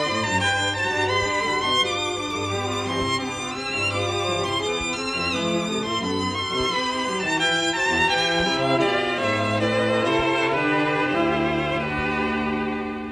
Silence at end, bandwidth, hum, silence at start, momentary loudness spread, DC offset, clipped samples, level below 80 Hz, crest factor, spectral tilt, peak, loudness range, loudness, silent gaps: 0 s; 13.5 kHz; none; 0 s; 5 LU; under 0.1%; under 0.1%; -48 dBFS; 14 dB; -4 dB/octave; -8 dBFS; 3 LU; -22 LUFS; none